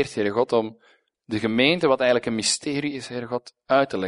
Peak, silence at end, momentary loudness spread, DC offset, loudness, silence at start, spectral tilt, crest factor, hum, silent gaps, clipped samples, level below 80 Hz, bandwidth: -4 dBFS; 0 s; 12 LU; under 0.1%; -23 LUFS; 0 s; -3.5 dB/octave; 20 dB; none; none; under 0.1%; -62 dBFS; 11 kHz